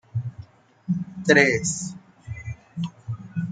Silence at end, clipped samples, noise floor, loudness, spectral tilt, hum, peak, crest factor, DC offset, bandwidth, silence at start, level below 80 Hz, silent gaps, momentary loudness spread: 0 s; under 0.1%; -45 dBFS; -23 LUFS; -4.5 dB/octave; none; -2 dBFS; 24 dB; under 0.1%; 9.6 kHz; 0.15 s; -56 dBFS; none; 21 LU